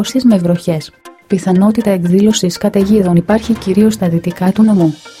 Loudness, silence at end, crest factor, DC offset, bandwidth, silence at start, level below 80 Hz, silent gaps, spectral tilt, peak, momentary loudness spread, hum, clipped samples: -12 LUFS; 0.1 s; 12 dB; under 0.1%; 15.5 kHz; 0 s; -42 dBFS; none; -6.5 dB/octave; 0 dBFS; 6 LU; none; under 0.1%